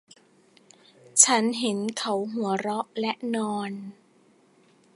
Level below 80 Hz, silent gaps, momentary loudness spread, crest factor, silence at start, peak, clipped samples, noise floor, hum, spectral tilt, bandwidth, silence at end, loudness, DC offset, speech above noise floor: -80 dBFS; none; 14 LU; 26 dB; 1.15 s; -2 dBFS; under 0.1%; -60 dBFS; none; -2 dB/octave; 11.5 kHz; 1.05 s; -24 LUFS; under 0.1%; 34 dB